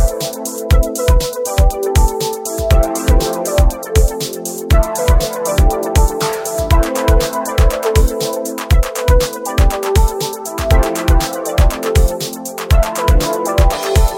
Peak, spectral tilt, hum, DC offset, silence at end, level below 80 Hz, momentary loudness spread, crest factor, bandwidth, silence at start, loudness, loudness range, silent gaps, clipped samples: 0 dBFS; -5 dB/octave; none; under 0.1%; 0 s; -14 dBFS; 6 LU; 12 dB; 17 kHz; 0 s; -15 LUFS; 1 LU; none; under 0.1%